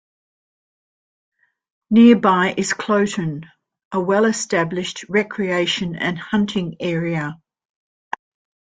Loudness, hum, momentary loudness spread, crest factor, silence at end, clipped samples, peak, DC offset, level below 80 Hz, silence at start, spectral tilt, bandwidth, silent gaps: -19 LUFS; none; 15 LU; 18 dB; 1.3 s; under 0.1%; -2 dBFS; under 0.1%; -60 dBFS; 1.9 s; -5 dB/octave; 9.4 kHz; 3.85-3.91 s